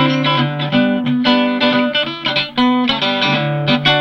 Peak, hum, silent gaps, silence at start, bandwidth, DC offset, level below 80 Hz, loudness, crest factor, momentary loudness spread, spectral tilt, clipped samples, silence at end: 0 dBFS; none; none; 0 s; 6.6 kHz; under 0.1%; -50 dBFS; -15 LUFS; 14 dB; 3 LU; -6 dB/octave; under 0.1%; 0 s